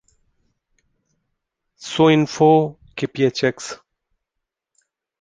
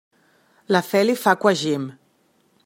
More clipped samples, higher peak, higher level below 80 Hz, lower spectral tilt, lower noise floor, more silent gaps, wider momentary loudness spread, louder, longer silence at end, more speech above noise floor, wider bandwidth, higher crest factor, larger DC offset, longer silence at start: neither; about the same, -2 dBFS vs -2 dBFS; first, -60 dBFS vs -72 dBFS; about the same, -6 dB/octave vs -5 dB/octave; first, -82 dBFS vs -63 dBFS; neither; first, 18 LU vs 9 LU; about the same, -18 LUFS vs -20 LUFS; first, 1.45 s vs 0.75 s; first, 65 dB vs 43 dB; second, 9.6 kHz vs 16.5 kHz; about the same, 20 dB vs 20 dB; neither; first, 1.8 s vs 0.7 s